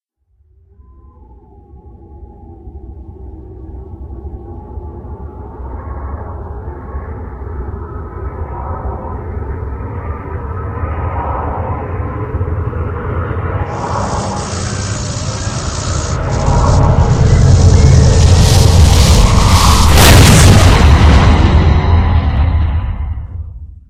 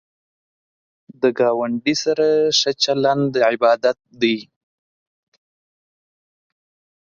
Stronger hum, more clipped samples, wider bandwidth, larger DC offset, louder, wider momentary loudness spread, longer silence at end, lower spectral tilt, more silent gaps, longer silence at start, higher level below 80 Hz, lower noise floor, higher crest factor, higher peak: neither; first, 0.7% vs under 0.1%; first, 16 kHz vs 7.6 kHz; neither; first, -12 LUFS vs -18 LUFS; first, 21 LU vs 5 LU; second, 0.1 s vs 2.6 s; about the same, -5 dB/octave vs -4 dB/octave; neither; first, 1.75 s vs 1.2 s; first, -16 dBFS vs -64 dBFS; second, -55 dBFS vs under -90 dBFS; second, 12 dB vs 18 dB; about the same, 0 dBFS vs -2 dBFS